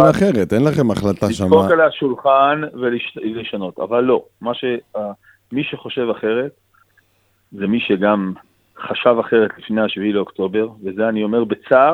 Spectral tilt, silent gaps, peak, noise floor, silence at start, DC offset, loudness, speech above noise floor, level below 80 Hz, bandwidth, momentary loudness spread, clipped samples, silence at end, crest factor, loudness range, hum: -7 dB/octave; none; 0 dBFS; -61 dBFS; 0 s; under 0.1%; -18 LUFS; 44 dB; -52 dBFS; 14.5 kHz; 12 LU; under 0.1%; 0 s; 18 dB; 7 LU; none